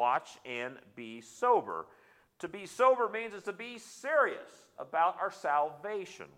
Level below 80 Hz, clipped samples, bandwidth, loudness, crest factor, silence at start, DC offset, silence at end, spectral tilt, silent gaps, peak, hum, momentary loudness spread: -84 dBFS; under 0.1%; 15 kHz; -32 LUFS; 20 dB; 0 s; under 0.1%; 0.1 s; -3.5 dB/octave; none; -14 dBFS; none; 17 LU